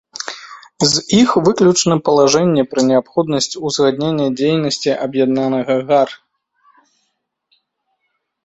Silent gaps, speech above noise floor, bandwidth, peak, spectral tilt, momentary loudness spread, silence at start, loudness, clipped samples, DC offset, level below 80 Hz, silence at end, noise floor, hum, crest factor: none; 56 dB; 8.2 kHz; 0 dBFS; -4.5 dB/octave; 6 LU; 0.2 s; -15 LUFS; under 0.1%; under 0.1%; -54 dBFS; 2.3 s; -70 dBFS; none; 16 dB